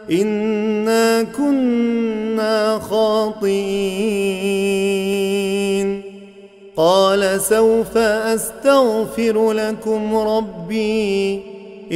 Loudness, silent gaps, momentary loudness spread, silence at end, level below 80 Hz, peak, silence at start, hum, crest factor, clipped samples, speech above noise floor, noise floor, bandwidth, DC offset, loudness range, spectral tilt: -18 LUFS; none; 7 LU; 0 s; -50 dBFS; -2 dBFS; 0 s; none; 16 dB; under 0.1%; 25 dB; -41 dBFS; 16 kHz; under 0.1%; 3 LU; -4.5 dB/octave